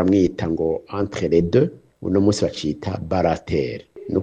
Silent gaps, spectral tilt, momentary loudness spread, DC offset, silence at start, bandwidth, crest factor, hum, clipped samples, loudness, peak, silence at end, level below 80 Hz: none; -7 dB/octave; 9 LU; under 0.1%; 0 s; 9.4 kHz; 18 dB; none; under 0.1%; -21 LUFS; -4 dBFS; 0 s; -44 dBFS